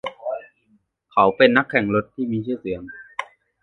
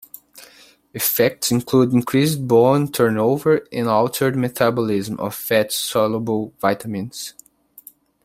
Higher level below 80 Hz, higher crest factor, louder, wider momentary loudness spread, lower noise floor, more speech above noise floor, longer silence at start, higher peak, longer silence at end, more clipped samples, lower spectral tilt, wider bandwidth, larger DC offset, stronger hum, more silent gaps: about the same, -56 dBFS vs -58 dBFS; about the same, 22 dB vs 18 dB; about the same, -20 LUFS vs -19 LUFS; first, 17 LU vs 11 LU; first, -63 dBFS vs -48 dBFS; first, 43 dB vs 29 dB; second, 0.05 s vs 0.35 s; about the same, 0 dBFS vs -2 dBFS; second, 0.4 s vs 0.95 s; neither; first, -7 dB/octave vs -5 dB/octave; second, 7.4 kHz vs 16.5 kHz; neither; neither; neither